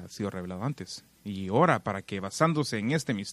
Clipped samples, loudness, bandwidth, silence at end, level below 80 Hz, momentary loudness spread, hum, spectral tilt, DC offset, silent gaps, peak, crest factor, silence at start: under 0.1%; -29 LUFS; 14 kHz; 0 s; -66 dBFS; 15 LU; none; -5.5 dB/octave; under 0.1%; none; -8 dBFS; 22 dB; 0 s